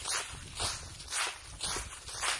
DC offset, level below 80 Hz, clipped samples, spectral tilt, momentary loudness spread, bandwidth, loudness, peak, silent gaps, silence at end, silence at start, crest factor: under 0.1%; -52 dBFS; under 0.1%; -0.5 dB/octave; 7 LU; 11.5 kHz; -36 LUFS; -16 dBFS; none; 0 s; 0 s; 22 dB